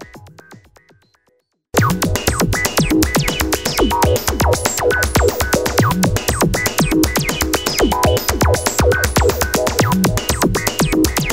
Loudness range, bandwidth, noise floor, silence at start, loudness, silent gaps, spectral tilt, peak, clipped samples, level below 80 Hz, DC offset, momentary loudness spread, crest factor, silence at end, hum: 2 LU; 16.5 kHz; -63 dBFS; 0 s; -16 LUFS; none; -4 dB/octave; 0 dBFS; under 0.1%; -26 dBFS; 0.9%; 2 LU; 16 dB; 0 s; none